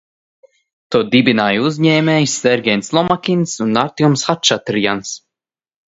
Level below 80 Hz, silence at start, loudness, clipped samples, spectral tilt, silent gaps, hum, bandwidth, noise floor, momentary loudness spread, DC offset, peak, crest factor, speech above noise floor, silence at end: -56 dBFS; 0.9 s; -15 LUFS; under 0.1%; -4.5 dB/octave; none; none; 8 kHz; -86 dBFS; 6 LU; under 0.1%; 0 dBFS; 16 dB; 72 dB; 0.75 s